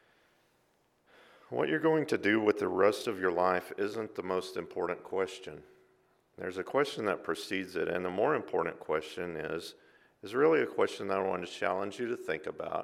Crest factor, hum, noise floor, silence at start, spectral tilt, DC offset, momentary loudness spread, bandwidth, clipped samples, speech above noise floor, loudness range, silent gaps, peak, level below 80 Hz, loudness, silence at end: 22 dB; none; -72 dBFS; 1.5 s; -5 dB/octave; under 0.1%; 11 LU; 15 kHz; under 0.1%; 40 dB; 5 LU; none; -12 dBFS; -72 dBFS; -32 LUFS; 0 s